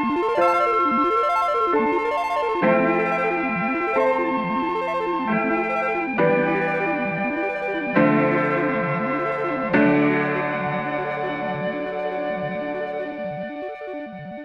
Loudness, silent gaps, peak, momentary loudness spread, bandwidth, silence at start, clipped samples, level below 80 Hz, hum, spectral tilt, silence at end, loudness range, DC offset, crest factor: -22 LUFS; none; -4 dBFS; 9 LU; 10.5 kHz; 0 s; under 0.1%; -56 dBFS; none; -7.5 dB/octave; 0 s; 6 LU; under 0.1%; 18 dB